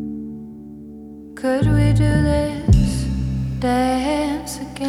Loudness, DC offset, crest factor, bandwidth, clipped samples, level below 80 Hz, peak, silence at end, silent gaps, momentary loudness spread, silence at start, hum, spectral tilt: -19 LUFS; under 0.1%; 18 dB; 14 kHz; under 0.1%; -26 dBFS; -2 dBFS; 0 s; none; 21 LU; 0 s; none; -7 dB/octave